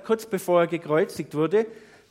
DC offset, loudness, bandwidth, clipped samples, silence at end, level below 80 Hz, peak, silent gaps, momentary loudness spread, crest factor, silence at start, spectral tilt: under 0.1%; -24 LUFS; 16.5 kHz; under 0.1%; 0.35 s; -72 dBFS; -8 dBFS; none; 5 LU; 16 dB; 0.05 s; -6 dB/octave